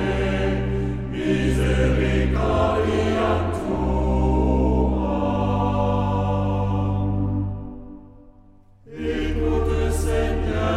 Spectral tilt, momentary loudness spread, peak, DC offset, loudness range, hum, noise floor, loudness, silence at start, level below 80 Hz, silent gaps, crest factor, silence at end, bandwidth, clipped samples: -7.5 dB/octave; 6 LU; -8 dBFS; under 0.1%; 5 LU; none; -50 dBFS; -22 LUFS; 0 s; -28 dBFS; none; 14 dB; 0 s; 12.5 kHz; under 0.1%